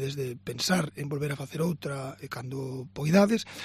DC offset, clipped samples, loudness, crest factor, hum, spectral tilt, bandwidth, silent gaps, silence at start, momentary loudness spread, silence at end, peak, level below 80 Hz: under 0.1%; under 0.1%; -29 LUFS; 22 dB; none; -5.5 dB/octave; 14.5 kHz; none; 0 s; 14 LU; 0 s; -8 dBFS; -62 dBFS